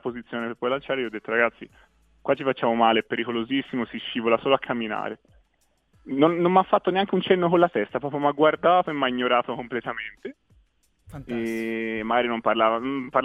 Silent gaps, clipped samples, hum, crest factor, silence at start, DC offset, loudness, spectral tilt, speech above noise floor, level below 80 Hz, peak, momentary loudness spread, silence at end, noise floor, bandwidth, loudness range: none; under 0.1%; none; 20 dB; 0.05 s; under 0.1%; -24 LUFS; -7 dB/octave; 45 dB; -60 dBFS; -4 dBFS; 12 LU; 0 s; -68 dBFS; 11.5 kHz; 6 LU